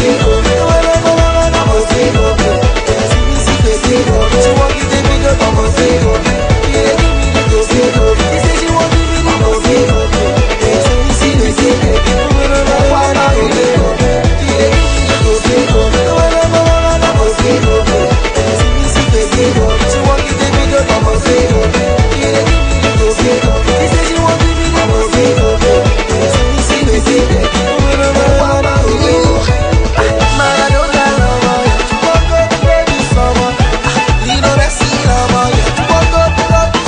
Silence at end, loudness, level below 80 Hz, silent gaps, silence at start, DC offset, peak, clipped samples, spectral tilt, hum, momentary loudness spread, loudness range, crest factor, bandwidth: 0 s; -10 LUFS; -16 dBFS; none; 0 s; under 0.1%; 0 dBFS; under 0.1%; -5 dB/octave; none; 2 LU; 1 LU; 10 dB; 10.5 kHz